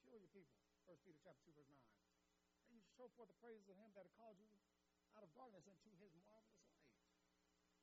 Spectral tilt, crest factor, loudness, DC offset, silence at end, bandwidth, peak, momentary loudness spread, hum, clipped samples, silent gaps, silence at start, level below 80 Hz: -5 dB/octave; 18 dB; -67 LUFS; under 0.1%; 0 s; 7.4 kHz; -52 dBFS; 3 LU; none; under 0.1%; none; 0 s; under -90 dBFS